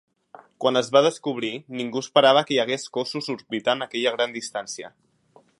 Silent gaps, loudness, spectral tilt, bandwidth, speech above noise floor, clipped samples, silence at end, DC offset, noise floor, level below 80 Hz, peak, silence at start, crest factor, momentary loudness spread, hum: none; -23 LUFS; -3.5 dB/octave; 11.5 kHz; 35 dB; under 0.1%; 0.7 s; under 0.1%; -58 dBFS; -78 dBFS; -2 dBFS; 0.6 s; 22 dB; 13 LU; none